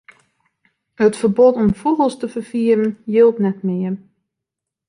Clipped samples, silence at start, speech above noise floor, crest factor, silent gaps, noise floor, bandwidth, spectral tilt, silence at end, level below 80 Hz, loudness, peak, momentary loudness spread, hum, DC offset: under 0.1%; 1 s; 67 dB; 16 dB; none; -83 dBFS; 11 kHz; -7.5 dB/octave; 0.9 s; -50 dBFS; -17 LUFS; -2 dBFS; 10 LU; none; under 0.1%